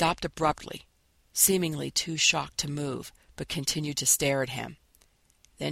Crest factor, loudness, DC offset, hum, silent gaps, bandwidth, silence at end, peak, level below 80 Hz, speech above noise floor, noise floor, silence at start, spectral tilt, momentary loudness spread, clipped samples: 22 dB; -27 LUFS; under 0.1%; none; none; 16.5 kHz; 0 s; -8 dBFS; -54 dBFS; 36 dB; -64 dBFS; 0 s; -2.5 dB/octave; 18 LU; under 0.1%